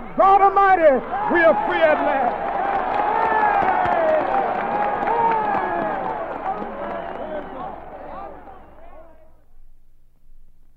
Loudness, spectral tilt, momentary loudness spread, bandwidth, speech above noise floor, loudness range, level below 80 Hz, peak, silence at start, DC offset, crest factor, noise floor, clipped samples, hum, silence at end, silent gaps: -19 LUFS; -7 dB/octave; 18 LU; 5.8 kHz; 29 dB; 17 LU; -44 dBFS; -4 dBFS; 0 s; under 0.1%; 16 dB; -45 dBFS; under 0.1%; 60 Hz at -55 dBFS; 0.3 s; none